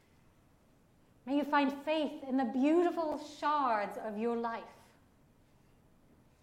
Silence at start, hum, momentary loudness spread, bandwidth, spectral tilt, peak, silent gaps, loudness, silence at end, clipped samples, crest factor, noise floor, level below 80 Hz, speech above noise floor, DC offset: 1.25 s; none; 10 LU; 15.5 kHz; -5.5 dB/octave; -18 dBFS; none; -33 LUFS; 1.7 s; under 0.1%; 18 dB; -66 dBFS; -72 dBFS; 33 dB; under 0.1%